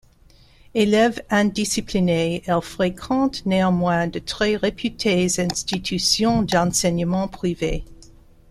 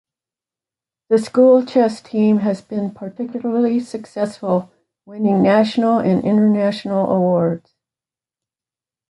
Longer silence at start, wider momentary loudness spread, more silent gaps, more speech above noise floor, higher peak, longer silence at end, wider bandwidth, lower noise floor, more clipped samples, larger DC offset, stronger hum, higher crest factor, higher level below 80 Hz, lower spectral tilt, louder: second, 0.75 s vs 1.1 s; second, 6 LU vs 11 LU; neither; second, 31 dB vs over 74 dB; about the same, -4 dBFS vs -2 dBFS; second, 0.5 s vs 1.5 s; first, 15 kHz vs 11.5 kHz; second, -52 dBFS vs under -90 dBFS; neither; neither; neither; about the same, 18 dB vs 16 dB; first, -42 dBFS vs -62 dBFS; second, -4.5 dB/octave vs -8 dB/octave; second, -21 LUFS vs -17 LUFS